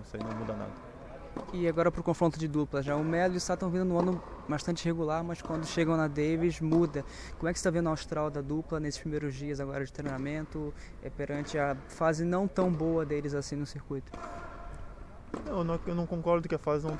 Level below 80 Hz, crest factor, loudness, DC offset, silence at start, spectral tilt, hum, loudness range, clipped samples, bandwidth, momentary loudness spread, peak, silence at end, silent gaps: -48 dBFS; 18 dB; -32 LUFS; under 0.1%; 0 s; -6.5 dB/octave; none; 5 LU; under 0.1%; 11 kHz; 14 LU; -12 dBFS; 0 s; none